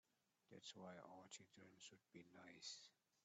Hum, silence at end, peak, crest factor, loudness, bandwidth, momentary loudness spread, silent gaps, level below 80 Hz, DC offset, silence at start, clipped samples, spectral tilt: none; 0.05 s; -44 dBFS; 20 dB; -61 LUFS; 8 kHz; 11 LU; none; under -90 dBFS; under 0.1%; 0.5 s; under 0.1%; -2.5 dB/octave